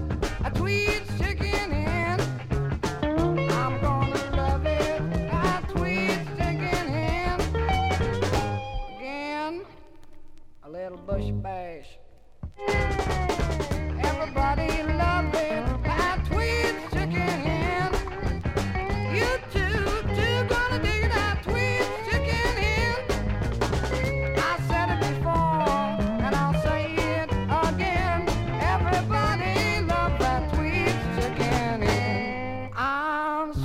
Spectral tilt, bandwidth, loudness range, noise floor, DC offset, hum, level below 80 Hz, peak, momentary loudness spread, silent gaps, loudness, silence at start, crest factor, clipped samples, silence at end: -6 dB/octave; 15.5 kHz; 5 LU; -47 dBFS; under 0.1%; none; -32 dBFS; -10 dBFS; 6 LU; none; -26 LUFS; 0 s; 16 dB; under 0.1%; 0 s